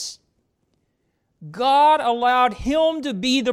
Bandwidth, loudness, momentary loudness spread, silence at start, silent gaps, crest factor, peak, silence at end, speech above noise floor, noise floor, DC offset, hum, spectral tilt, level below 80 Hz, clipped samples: 15 kHz; -19 LUFS; 9 LU; 0 s; none; 14 dB; -8 dBFS; 0 s; 52 dB; -70 dBFS; under 0.1%; none; -3.5 dB/octave; -46 dBFS; under 0.1%